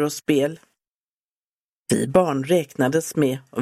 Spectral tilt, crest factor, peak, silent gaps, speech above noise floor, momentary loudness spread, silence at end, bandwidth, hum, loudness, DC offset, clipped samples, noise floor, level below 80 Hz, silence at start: -5.5 dB/octave; 20 dB; -4 dBFS; 0.87-1.83 s; over 69 dB; 5 LU; 0 s; 15.5 kHz; none; -21 LUFS; under 0.1%; under 0.1%; under -90 dBFS; -60 dBFS; 0 s